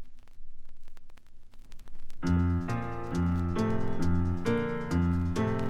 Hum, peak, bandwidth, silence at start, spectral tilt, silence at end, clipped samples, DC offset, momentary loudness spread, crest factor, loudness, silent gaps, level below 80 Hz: none; -16 dBFS; 9.8 kHz; 0 s; -8 dB/octave; 0 s; under 0.1%; under 0.1%; 5 LU; 14 dB; -30 LUFS; none; -40 dBFS